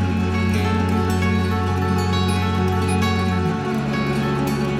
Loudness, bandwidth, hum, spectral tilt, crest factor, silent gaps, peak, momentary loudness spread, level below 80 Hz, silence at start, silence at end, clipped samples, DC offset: -20 LUFS; 15 kHz; none; -6.5 dB/octave; 12 dB; none; -8 dBFS; 2 LU; -40 dBFS; 0 s; 0 s; under 0.1%; under 0.1%